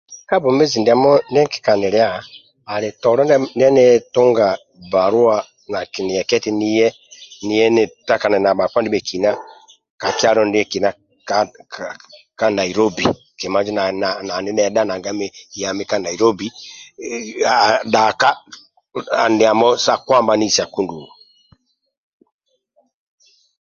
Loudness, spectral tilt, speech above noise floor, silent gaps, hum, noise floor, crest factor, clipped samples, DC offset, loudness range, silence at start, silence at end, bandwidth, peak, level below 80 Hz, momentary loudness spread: -16 LUFS; -4 dB/octave; 46 dB; 9.90-9.98 s; none; -62 dBFS; 18 dB; under 0.1%; under 0.1%; 5 LU; 0.1 s; 2.55 s; 7.4 kHz; 0 dBFS; -56 dBFS; 14 LU